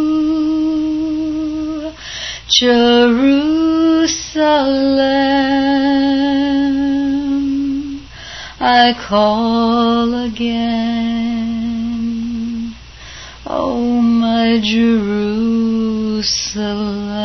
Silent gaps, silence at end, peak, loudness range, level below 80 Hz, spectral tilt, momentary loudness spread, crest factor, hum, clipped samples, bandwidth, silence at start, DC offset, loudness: none; 0 s; 0 dBFS; 6 LU; -40 dBFS; -4 dB/octave; 12 LU; 14 dB; none; under 0.1%; 6.4 kHz; 0 s; under 0.1%; -15 LUFS